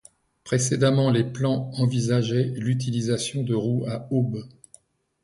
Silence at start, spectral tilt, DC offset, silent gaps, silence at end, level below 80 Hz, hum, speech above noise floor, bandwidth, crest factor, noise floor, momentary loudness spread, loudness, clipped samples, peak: 0.45 s; -6 dB/octave; under 0.1%; none; 0.75 s; -58 dBFS; none; 34 dB; 11.5 kHz; 16 dB; -57 dBFS; 6 LU; -24 LUFS; under 0.1%; -8 dBFS